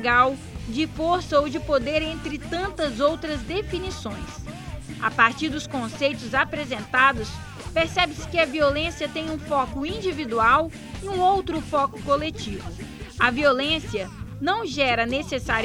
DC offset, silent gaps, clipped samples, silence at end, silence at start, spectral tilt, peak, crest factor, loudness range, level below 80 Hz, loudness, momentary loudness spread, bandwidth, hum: under 0.1%; none; under 0.1%; 0 s; 0 s; -4.5 dB/octave; -2 dBFS; 22 dB; 3 LU; -42 dBFS; -24 LUFS; 14 LU; 16 kHz; none